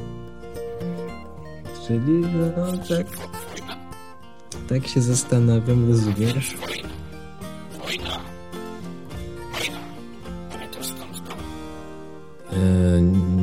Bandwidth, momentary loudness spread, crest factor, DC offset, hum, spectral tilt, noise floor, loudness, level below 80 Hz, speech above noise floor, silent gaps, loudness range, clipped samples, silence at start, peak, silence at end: 16.5 kHz; 20 LU; 18 dB; 0.9%; none; -6 dB/octave; -45 dBFS; -23 LUFS; -44 dBFS; 25 dB; none; 11 LU; under 0.1%; 0 s; -6 dBFS; 0 s